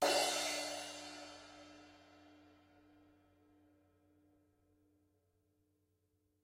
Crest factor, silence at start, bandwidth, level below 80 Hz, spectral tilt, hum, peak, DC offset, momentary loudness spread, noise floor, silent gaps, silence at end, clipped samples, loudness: 24 dB; 0 s; 16.5 kHz; -86 dBFS; -0.5 dB/octave; none; -20 dBFS; under 0.1%; 25 LU; -81 dBFS; none; 4.1 s; under 0.1%; -39 LUFS